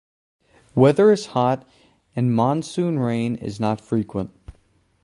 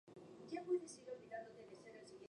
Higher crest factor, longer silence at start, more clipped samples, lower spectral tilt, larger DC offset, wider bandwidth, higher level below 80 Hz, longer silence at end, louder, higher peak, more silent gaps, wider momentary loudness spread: about the same, 20 dB vs 20 dB; first, 0.75 s vs 0.05 s; neither; first, -7.5 dB/octave vs -5 dB/octave; neither; about the same, 11.5 kHz vs 11 kHz; first, -54 dBFS vs -90 dBFS; first, 0.5 s vs 0 s; first, -21 LUFS vs -49 LUFS; first, -2 dBFS vs -30 dBFS; neither; second, 12 LU vs 16 LU